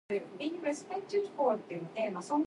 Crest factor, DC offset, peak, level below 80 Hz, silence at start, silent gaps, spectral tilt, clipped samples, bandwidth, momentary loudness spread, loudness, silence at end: 16 dB; under 0.1%; -18 dBFS; -82 dBFS; 0.1 s; none; -5.5 dB/octave; under 0.1%; 11.5 kHz; 7 LU; -35 LUFS; 0 s